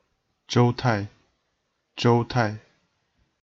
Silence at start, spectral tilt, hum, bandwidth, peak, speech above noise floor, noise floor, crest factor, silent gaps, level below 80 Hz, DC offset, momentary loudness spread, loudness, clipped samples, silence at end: 0.5 s; -6.5 dB/octave; none; 7.6 kHz; -8 dBFS; 53 dB; -75 dBFS; 18 dB; none; -56 dBFS; under 0.1%; 18 LU; -23 LUFS; under 0.1%; 0.85 s